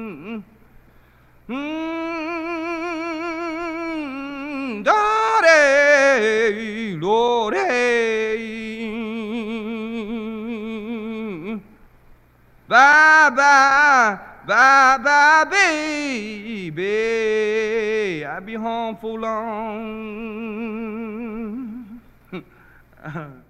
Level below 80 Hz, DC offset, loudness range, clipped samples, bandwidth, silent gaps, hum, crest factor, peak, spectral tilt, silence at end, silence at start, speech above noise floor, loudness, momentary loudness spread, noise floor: -54 dBFS; under 0.1%; 15 LU; under 0.1%; 13 kHz; none; none; 18 dB; -2 dBFS; -3.5 dB/octave; 0.15 s; 0 s; 34 dB; -18 LUFS; 18 LU; -53 dBFS